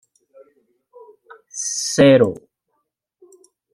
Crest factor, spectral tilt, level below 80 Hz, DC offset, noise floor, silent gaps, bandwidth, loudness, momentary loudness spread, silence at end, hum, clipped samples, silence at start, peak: 20 dB; -4.5 dB/octave; -58 dBFS; under 0.1%; -74 dBFS; none; 12.5 kHz; -16 LUFS; 21 LU; 1.4 s; none; under 0.1%; 1.55 s; -2 dBFS